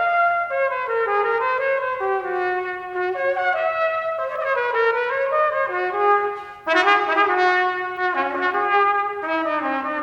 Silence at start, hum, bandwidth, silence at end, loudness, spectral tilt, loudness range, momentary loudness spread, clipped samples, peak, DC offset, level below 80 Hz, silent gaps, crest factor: 0 s; none; 9 kHz; 0 s; -21 LUFS; -4 dB/octave; 3 LU; 7 LU; under 0.1%; -4 dBFS; under 0.1%; -64 dBFS; none; 18 dB